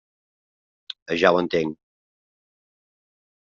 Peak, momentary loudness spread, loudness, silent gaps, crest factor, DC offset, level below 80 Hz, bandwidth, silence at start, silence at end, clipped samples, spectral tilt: -4 dBFS; 19 LU; -22 LUFS; 1.02-1.06 s; 24 dB; under 0.1%; -64 dBFS; 7.4 kHz; 0.9 s; 1.7 s; under 0.1%; -3 dB/octave